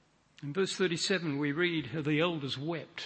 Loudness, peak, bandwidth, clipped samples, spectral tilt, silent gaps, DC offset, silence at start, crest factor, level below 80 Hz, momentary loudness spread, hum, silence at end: -32 LUFS; -16 dBFS; 8.8 kHz; under 0.1%; -4.5 dB/octave; none; under 0.1%; 0.4 s; 18 dB; -72 dBFS; 7 LU; none; 0 s